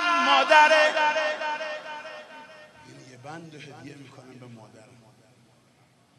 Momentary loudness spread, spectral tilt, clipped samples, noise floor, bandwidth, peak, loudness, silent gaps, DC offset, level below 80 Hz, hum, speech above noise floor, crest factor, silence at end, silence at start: 28 LU; -2 dB/octave; under 0.1%; -61 dBFS; 12 kHz; -2 dBFS; -20 LUFS; none; under 0.1%; -82 dBFS; none; 37 dB; 24 dB; 1.6 s; 0 s